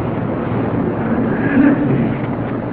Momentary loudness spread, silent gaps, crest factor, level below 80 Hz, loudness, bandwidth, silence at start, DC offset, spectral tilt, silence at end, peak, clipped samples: 8 LU; none; 14 dB; -38 dBFS; -17 LUFS; 4.4 kHz; 0 s; under 0.1%; -12.5 dB/octave; 0 s; -2 dBFS; under 0.1%